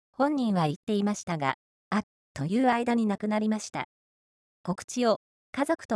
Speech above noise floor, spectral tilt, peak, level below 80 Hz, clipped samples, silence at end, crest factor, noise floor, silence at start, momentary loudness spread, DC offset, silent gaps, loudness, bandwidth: over 63 dB; -5.5 dB/octave; -10 dBFS; -68 dBFS; under 0.1%; 0 s; 18 dB; under -90 dBFS; 0.2 s; 12 LU; under 0.1%; 0.76-0.87 s, 1.23-1.27 s, 1.54-1.91 s, 2.03-2.35 s, 3.84-4.64 s, 4.84-4.88 s, 5.16-5.53 s, 5.85-5.89 s; -29 LUFS; 11 kHz